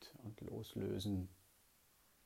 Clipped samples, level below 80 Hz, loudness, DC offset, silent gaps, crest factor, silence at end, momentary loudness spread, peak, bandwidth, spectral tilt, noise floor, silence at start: under 0.1%; -68 dBFS; -46 LUFS; under 0.1%; none; 16 dB; 0.9 s; 12 LU; -32 dBFS; 16 kHz; -6.5 dB/octave; -72 dBFS; 0 s